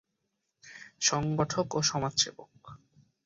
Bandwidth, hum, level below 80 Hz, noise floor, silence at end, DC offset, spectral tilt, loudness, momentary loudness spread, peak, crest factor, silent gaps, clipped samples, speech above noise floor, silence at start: 7.8 kHz; none; -62 dBFS; -81 dBFS; 0.5 s; under 0.1%; -3 dB/octave; -29 LUFS; 21 LU; -12 dBFS; 22 dB; none; under 0.1%; 51 dB; 0.65 s